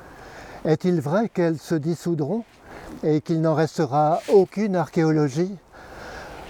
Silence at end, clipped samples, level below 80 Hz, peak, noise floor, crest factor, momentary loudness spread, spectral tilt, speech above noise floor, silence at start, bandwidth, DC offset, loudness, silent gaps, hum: 0 s; under 0.1%; -56 dBFS; -6 dBFS; -42 dBFS; 18 dB; 21 LU; -7.5 dB/octave; 20 dB; 0 s; 15 kHz; under 0.1%; -22 LUFS; none; none